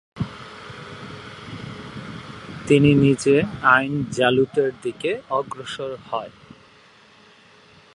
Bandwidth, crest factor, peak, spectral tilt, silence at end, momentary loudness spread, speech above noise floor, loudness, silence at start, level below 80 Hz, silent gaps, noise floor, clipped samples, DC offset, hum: 11 kHz; 22 dB; -2 dBFS; -6 dB/octave; 1.65 s; 20 LU; 32 dB; -20 LUFS; 0.15 s; -52 dBFS; none; -51 dBFS; under 0.1%; under 0.1%; none